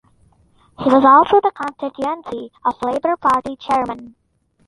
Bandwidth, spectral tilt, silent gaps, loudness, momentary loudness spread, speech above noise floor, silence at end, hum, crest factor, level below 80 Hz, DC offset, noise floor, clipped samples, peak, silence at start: 11.5 kHz; -6 dB/octave; none; -17 LUFS; 16 LU; 38 dB; 0.6 s; none; 18 dB; -54 dBFS; under 0.1%; -55 dBFS; under 0.1%; 0 dBFS; 0.8 s